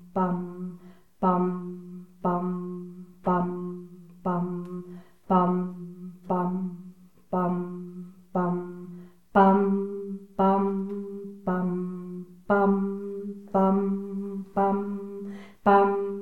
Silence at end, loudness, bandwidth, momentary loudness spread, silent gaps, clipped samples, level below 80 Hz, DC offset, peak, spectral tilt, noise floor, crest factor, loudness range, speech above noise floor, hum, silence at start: 0 s; -27 LUFS; 4.3 kHz; 19 LU; none; under 0.1%; -64 dBFS; 0.2%; -6 dBFS; -10 dB/octave; -50 dBFS; 20 dB; 5 LU; 25 dB; none; 0 s